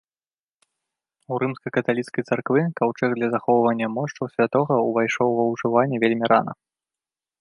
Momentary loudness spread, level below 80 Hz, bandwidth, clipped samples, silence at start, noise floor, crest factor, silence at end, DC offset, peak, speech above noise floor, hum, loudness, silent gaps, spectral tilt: 7 LU; -68 dBFS; 11 kHz; under 0.1%; 1.3 s; under -90 dBFS; 20 dB; 0.9 s; under 0.1%; -2 dBFS; over 69 dB; none; -22 LUFS; none; -7 dB/octave